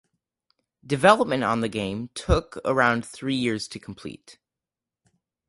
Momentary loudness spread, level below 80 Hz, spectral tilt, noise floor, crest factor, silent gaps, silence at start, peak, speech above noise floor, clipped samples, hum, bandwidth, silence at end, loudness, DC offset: 18 LU; -40 dBFS; -5 dB/octave; -89 dBFS; 24 dB; none; 0.85 s; -2 dBFS; 65 dB; under 0.1%; none; 11.5 kHz; 1.15 s; -23 LUFS; under 0.1%